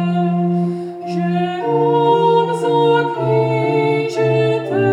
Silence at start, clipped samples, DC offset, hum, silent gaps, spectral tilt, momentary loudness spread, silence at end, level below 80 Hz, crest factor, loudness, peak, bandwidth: 0 s; under 0.1%; under 0.1%; none; none; -7.5 dB/octave; 6 LU; 0 s; -74 dBFS; 12 dB; -16 LUFS; -4 dBFS; 10.5 kHz